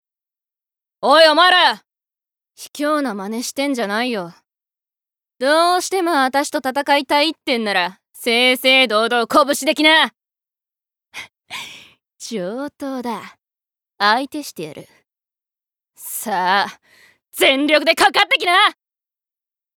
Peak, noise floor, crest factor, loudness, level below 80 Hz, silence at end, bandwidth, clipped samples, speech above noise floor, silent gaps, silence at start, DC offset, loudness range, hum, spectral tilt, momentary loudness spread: -2 dBFS; -88 dBFS; 18 dB; -16 LUFS; -68 dBFS; 1.1 s; 20 kHz; under 0.1%; 72 dB; none; 1 s; under 0.1%; 9 LU; none; -2 dB/octave; 19 LU